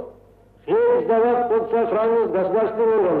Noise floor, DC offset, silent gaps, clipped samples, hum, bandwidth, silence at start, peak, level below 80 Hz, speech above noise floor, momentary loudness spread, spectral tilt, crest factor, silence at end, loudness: -51 dBFS; under 0.1%; none; under 0.1%; none; 4.2 kHz; 0 s; -8 dBFS; -58 dBFS; 32 dB; 4 LU; -9.5 dB/octave; 10 dB; 0 s; -19 LUFS